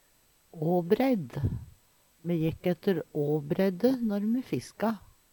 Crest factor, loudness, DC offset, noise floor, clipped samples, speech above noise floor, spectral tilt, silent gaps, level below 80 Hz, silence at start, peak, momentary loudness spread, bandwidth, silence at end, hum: 18 dB; -29 LUFS; under 0.1%; -65 dBFS; under 0.1%; 37 dB; -8 dB/octave; none; -54 dBFS; 0.55 s; -12 dBFS; 8 LU; 19 kHz; 0.35 s; none